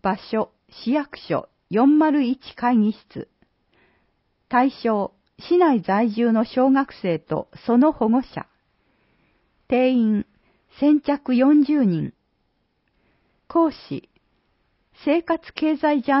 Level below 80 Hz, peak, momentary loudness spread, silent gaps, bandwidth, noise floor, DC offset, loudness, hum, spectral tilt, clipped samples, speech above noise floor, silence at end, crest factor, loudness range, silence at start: -60 dBFS; -6 dBFS; 14 LU; none; 5.8 kHz; -69 dBFS; under 0.1%; -21 LUFS; none; -11 dB/octave; under 0.1%; 50 dB; 0 s; 16 dB; 5 LU; 0.05 s